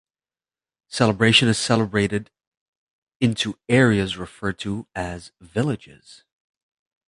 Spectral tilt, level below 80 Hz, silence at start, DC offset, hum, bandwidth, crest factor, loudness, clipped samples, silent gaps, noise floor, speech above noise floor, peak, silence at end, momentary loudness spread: -5 dB/octave; -50 dBFS; 0.9 s; under 0.1%; none; 11.5 kHz; 22 dB; -21 LUFS; under 0.1%; 2.47-3.07 s, 3.16-3.20 s; under -90 dBFS; over 69 dB; -2 dBFS; 1.35 s; 15 LU